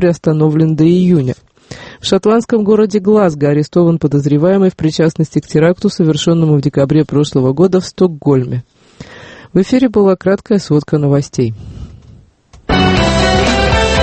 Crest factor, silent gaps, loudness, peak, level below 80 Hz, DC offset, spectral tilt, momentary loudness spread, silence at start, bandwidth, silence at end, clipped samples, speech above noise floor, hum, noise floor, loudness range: 12 dB; none; -12 LUFS; 0 dBFS; -30 dBFS; under 0.1%; -6.5 dB/octave; 8 LU; 0 s; 8.8 kHz; 0 s; under 0.1%; 32 dB; none; -43 dBFS; 2 LU